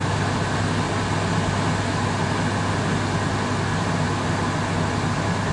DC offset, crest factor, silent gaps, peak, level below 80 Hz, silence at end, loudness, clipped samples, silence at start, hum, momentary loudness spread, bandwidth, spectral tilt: under 0.1%; 12 dB; none; -10 dBFS; -42 dBFS; 0 s; -23 LUFS; under 0.1%; 0 s; none; 1 LU; 11 kHz; -5.5 dB/octave